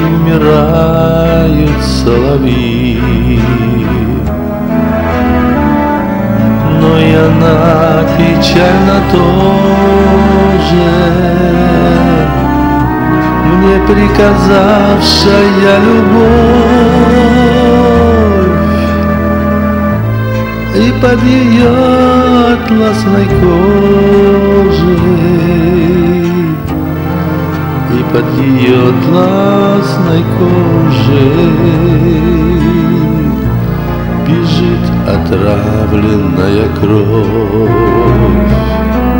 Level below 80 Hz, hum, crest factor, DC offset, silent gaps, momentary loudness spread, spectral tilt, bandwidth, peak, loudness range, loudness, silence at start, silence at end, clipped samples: -20 dBFS; none; 8 dB; under 0.1%; none; 5 LU; -7.5 dB/octave; 16.5 kHz; 0 dBFS; 4 LU; -8 LUFS; 0 s; 0 s; 3%